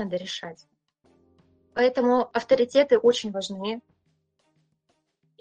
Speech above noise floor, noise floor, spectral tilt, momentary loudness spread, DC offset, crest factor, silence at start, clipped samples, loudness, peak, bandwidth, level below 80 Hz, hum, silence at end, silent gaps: 50 dB; -73 dBFS; -4.5 dB/octave; 15 LU; under 0.1%; 18 dB; 0 s; under 0.1%; -24 LUFS; -8 dBFS; 9 kHz; -68 dBFS; none; 1.6 s; none